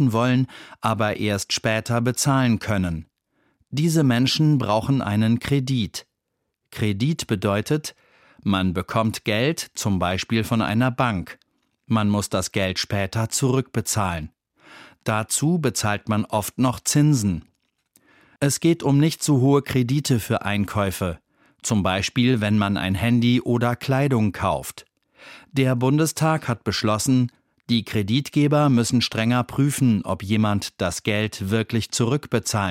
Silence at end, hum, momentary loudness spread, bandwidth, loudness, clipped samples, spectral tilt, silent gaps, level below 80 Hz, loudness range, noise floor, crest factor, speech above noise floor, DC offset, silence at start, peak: 0 s; none; 7 LU; 16.5 kHz; -22 LUFS; under 0.1%; -5 dB/octave; none; -50 dBFS; 3 LU; -78 dBFS; 16 dB; 57 dB; under 0.1%; 0 s; -6 dBFS